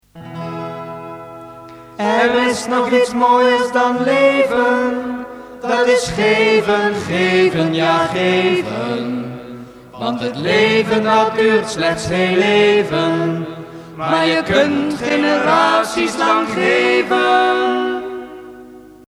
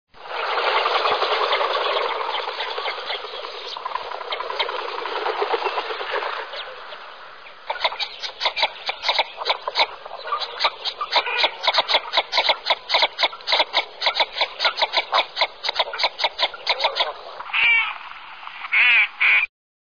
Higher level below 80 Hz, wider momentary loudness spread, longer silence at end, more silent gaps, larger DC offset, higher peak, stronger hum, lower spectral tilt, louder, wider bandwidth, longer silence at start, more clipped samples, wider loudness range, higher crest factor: first, -50 dBFS vs -64 dBFS; about the same, 16 LU vs 15 LU; second, 0.3 s vs 0.55 s; neither; second, under 0.1% vs 0.4%; first, 0 dBFS vs -4 dBFS; first, 50 Hz at -55 dBFS vs none; first, -4.5 dB/octave vs 0 dB/octave; first, -15 LUFS vs -21 LUFS; first, 14 kHz vs 5.4 kHz; about the same, 0.15 s vs 0.15 s; neither; second, 3 LU vs 7 LU; about the same, 16 dB vs 18 dB